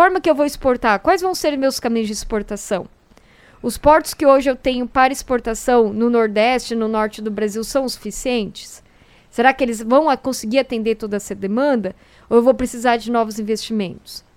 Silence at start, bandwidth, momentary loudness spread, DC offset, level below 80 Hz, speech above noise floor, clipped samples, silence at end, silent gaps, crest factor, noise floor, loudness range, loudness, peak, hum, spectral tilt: 0 s; 16.5 kHz; 10 LU; under 0.1%; -42 dBFS; 32 dB; under 0.1%; 0.15 s; none; 18 dB; -50 dBFS; 4 LU; -18 LUFS; 0 dBFS; none; -4 dB/octave